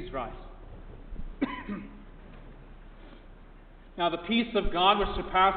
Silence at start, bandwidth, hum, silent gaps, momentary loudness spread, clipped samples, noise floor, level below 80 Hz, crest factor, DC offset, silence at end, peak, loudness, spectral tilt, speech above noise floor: 0 s; 4.7 kHz; none; none; 27 LU; under 0.1%; -50 dBFS; -42 dBFS; 22 dB; under 0.1%; 0 s; -10 dBFS; -29 LUFS; -8.5 dB/octave; 23 dB